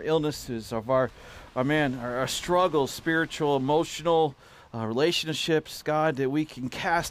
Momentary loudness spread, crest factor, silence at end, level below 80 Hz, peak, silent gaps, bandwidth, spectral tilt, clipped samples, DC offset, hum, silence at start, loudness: 9 LU; 14 dB; 0 s; -54 dBFS; -12 dBFS; none; 15.5 kHz; -4.5 dB/octave; under 0.1%; under 0.1%; none; 0 s; -27 LUFS